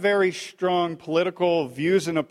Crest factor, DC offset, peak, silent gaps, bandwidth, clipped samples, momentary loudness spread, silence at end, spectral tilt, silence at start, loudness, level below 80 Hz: 14 dB; under 0.1%; -8 dBFS; none; 13 kHz; under 0.1%; 3 LU; 0.05 s; -5.5 dB/octave; 0 s; -24 LUFS; -68 dBFS